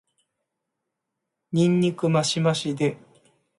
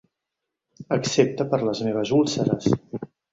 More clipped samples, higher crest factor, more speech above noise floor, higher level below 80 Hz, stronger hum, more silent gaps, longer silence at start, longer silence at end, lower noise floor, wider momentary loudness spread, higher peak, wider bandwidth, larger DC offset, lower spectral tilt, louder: neither; about the same, 16 dB vs 20 dB; about the same, 60 dB vs 61 dB; second, -66 dBFS vs -58 dBFS; neither; neither; first, 1.5 s vs 0.8 s; first, 0.6 s vs 0.25 s; about the same, -82 dBFS vs -84 dBFS; about the same, 6 LU vs 6 LU; second, -10 dBFS vs -4 dBFS; first, 11.5 kHz vs 8 kHz; neither; about the same, -5.5 dB/octave vs -5.5 dB/octave; about the same, -23 LUFS vs -23 LUFS